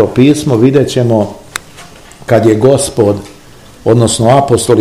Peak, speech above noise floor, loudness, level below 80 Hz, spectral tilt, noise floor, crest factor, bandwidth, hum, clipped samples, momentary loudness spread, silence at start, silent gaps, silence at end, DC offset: 0 dBFS; 28 dB; -10 LUFS; -40 dBFS; -6 dB/octave; -36 dBFS; 10 dB; 15.5 kHz; none; 2%; 13 LU; 0 s; none; 0 s; 0.8%